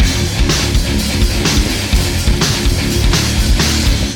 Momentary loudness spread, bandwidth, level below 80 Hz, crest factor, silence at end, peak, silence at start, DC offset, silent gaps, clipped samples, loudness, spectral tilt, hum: 2 LU; 18.5 kHz; -16 dBFS; 12 dB; 0 s; -2 dBFS; 0 s; under 0.1%; none; under 0.1%; -14 LUFS; -4 dB/octave; none